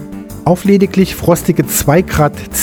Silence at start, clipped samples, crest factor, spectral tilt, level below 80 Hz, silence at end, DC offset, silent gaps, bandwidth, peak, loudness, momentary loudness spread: 0 s; under 0.1%; 12 dB; -5.5 dB/octave; -32 dBFS; 0 s; under 0.1%; none; over 20 kHz; 0 dBFS; -12 LUFS; 4 LU